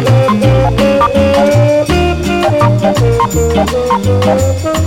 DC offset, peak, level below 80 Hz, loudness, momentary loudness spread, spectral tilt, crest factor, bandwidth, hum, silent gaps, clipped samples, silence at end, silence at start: under 0.1%; 0 dBFS; -24 dBFS; -10 LUFS; 3 LU; -6.5 dB/octave; 10 dB; 16.5 kHz; none; none; under 0.1%; 0 s; 0 s